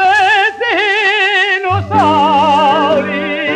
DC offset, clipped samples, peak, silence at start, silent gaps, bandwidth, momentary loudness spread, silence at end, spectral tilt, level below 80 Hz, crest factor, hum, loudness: under 0.1%; under 0.1%; -2 dBFS; 0 s; none; 11 kHz; 5 LU; 0 s; -4.5 dB/octave; -54 dBFS; 10 dB; none; -11 LUFS